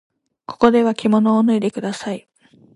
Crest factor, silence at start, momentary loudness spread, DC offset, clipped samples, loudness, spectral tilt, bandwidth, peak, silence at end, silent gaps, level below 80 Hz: 18 dB; 0.5 s; 14 LU; under 0.1%; under 0.1%; -17 LUFS; -6.5 dB/octave; 11 kHz; 0 dBFS; 0.55 s; none; -58 dBFS